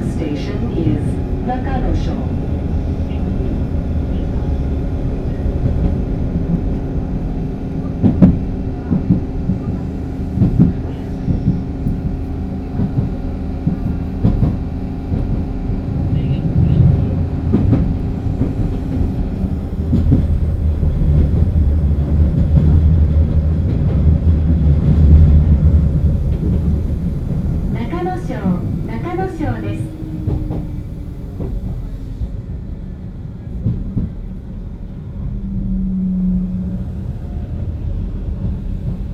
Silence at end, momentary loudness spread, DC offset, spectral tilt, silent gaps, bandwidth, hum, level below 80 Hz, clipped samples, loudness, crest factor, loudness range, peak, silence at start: 0 s; 12 LU; under 0.1%; -10 dB/octave; none; 5.6 kHz; none; -20 dBFS; under 0.1%; -18 LUFS; 16 dB; 10 LU; 0 dBFS; 0 s